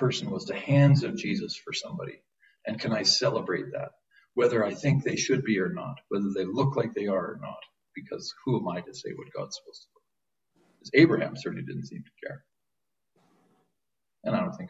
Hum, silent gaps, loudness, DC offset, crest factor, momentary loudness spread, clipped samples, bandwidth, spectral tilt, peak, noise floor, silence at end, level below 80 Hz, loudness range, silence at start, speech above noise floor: none; none; -28 LUFS; under 0.1%; 22 dB; 19 LU; under 0.1%; 8 kHz; -5.5 dB/octave; -6 dBFS; -87 dBFS; 0 s; -66 dBFS; 10 LU; 0 s; 59 dB